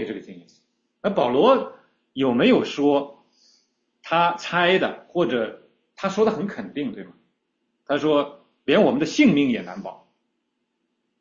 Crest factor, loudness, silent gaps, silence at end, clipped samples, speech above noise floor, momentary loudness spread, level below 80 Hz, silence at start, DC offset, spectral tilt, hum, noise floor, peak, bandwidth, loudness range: 18 dB; -21 LUFS; none; 1.25 s; under 0.1%; 55 dB; 16 LU; -64 dBFS; 0 s; under 0.1%; -5.5 dB/octave; none; -75 dBFS; -6 dBFS; 7.4 kHz; 4 LU